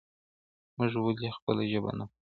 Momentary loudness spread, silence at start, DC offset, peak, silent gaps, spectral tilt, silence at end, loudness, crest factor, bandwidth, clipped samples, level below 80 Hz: 9 LU; 0.8 s; under 0.1%; -14 dBFS; 1.42-1.47 s; -10 dB/octave; 0.3 s; -32 LUFS; 20 dB; 4.6 kHz; under 0.1%; -64 dBFS